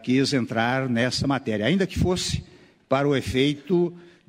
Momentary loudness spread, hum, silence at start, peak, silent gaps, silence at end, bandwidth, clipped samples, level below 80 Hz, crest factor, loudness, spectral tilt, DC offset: 4 LU; none; 0 s; -8 dBFS; none; 0.3 s; 15.5 kHz; under 0.1%; -44 dBFS; 16 dB; -24 LUFS; -5.5 dB/octave; under 0.1%